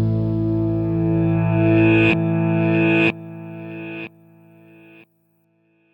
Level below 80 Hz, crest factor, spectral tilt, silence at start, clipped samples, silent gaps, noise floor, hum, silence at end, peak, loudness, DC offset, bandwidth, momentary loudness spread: -44 dBFS; 16 dB; -9.5 dB/octave; 0 s; under 0.1%; none; -63 dBFS; none; 1.85 s; -4 dBFS; -18 LUFS; under 0.1%; 5.2 kHz; 18 LU